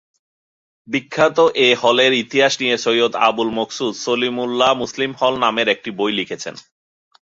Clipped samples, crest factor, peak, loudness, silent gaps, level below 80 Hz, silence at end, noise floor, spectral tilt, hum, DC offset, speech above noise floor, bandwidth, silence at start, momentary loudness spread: under 0.1%; 18 dB; -2 dBFS; -17 LUFS; none; -62 dBFS; 0.7 s; under -90 dBFS; -3 dB/octave; none; under 0.1%; over 73 dB; 7.8 kHz; 0.9 s; 9 LU